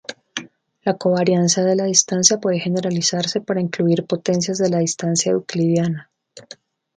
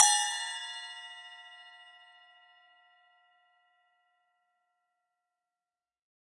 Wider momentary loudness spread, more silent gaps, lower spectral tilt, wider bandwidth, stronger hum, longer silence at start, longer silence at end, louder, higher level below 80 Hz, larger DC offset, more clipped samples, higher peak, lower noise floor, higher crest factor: second, 10 LU vs 26 LU; neither; first, -4 dB/octave vs 8 dB/octave; second, 9.6 kHz vs 11.5 kHz; neither; about the same, 0.1 s vs 0 s; second, 0.55 s vs 4.4 s; first, -18 LUFS vs -31 LUFS; first, -64 dBFS vs under -90 dBFS; neither; neither; first, 0 dBFS vs -8 dBFS; second, -45 dBFS vs under -90 dBFS; second, 20 dB vs 30 dB